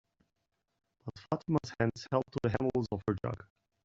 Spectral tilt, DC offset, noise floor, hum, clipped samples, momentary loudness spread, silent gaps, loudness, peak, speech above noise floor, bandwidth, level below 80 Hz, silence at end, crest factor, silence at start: -7 dB/octave; under 0.1%; -83 dBFS; none; under 0.1%; 15 LU; none; -34 LUFS; -14 dBFS; 50 dB; 7.8 kHz; -62 dBFS; 0.4 s; 22 dB; 1.05 s